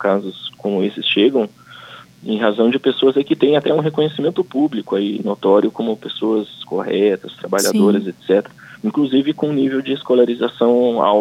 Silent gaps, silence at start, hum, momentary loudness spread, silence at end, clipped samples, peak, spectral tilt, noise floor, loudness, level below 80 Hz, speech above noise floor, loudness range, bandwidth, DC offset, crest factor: none; 0 s; none; 10 LU; 0 s; under 0.1%; -2 dBFS; -5 dB/octave; -39 dBFS; -17 LUFS; -68 dBFS; 23 dB; 2 LU; 16.5 kHz; under 0.1%; 16 dB